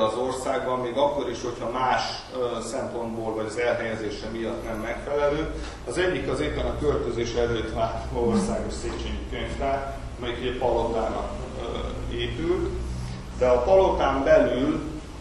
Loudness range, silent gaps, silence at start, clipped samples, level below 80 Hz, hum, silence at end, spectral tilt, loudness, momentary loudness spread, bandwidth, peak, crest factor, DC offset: 5 LU; none; 0 s; under 0.1%; -36 dBFS; none; 0 s; -5.5 dB/octave; -26 LUFS; 12 LU; 12 kHz; -6 dBFS; 18 dB; under 0.1%